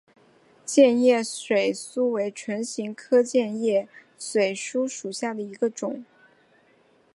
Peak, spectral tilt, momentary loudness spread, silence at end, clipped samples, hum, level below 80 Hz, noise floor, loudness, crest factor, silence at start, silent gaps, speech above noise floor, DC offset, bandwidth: -6 dBFS; -4 dB/octave; 14 LU; 1.1 s; under 0.1%; none; -82 dBFS; -61 dBFS; -24 LUFS; 20 dB; 0.65 s; none; 37 dB; under 0.1%; 11.5 kHz